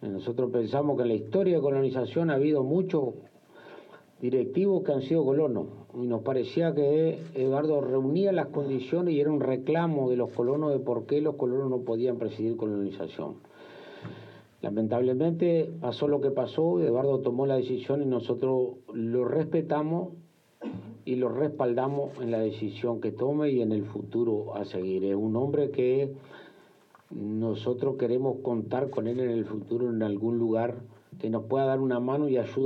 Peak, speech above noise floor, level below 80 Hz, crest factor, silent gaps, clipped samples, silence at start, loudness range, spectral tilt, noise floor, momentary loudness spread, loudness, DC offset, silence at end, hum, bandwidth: -14 dBFS; 31 dB; -80 dBFS; 14 dB; none; under 0.1%; 0 s; 4 LU; -9.5 dB/octave; -58 dBFS; 9 LU; -28 LUFS; under 0.1%; 0 s; none; 6.2 kHz